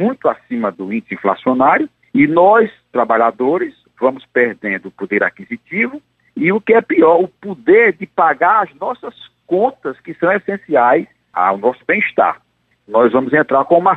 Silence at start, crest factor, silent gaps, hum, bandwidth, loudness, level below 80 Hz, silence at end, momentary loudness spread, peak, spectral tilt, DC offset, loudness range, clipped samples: 0 s; 14 dB; none; none; 4.2 kHz; -15 LUFS; -62 dBFS; 0 s; 12 LU; 0 dBFS; -8.5 dB/octave; under 0.1%; 4 LU; under 0.1%